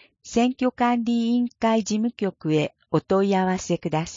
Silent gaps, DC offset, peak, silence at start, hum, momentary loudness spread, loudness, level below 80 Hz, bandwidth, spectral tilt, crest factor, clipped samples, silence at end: none; under 0.1%; -8 dBFS; 0.25 s; none; 5 LU; -23 LUFS; -56 dBFS; 7.6 kHz; -6 dB/octave; 14 dB; under 0.1%; 0 s